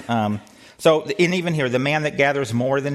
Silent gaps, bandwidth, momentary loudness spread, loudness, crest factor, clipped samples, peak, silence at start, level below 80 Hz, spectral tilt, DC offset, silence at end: none; 14.5 kHz; 4 LU; -20 LUFS; 18 dB; under 0.1%; -4 dBFS; 0 s; -60 dBFS; -5.5 dB/octave; under 0.1%; 0 s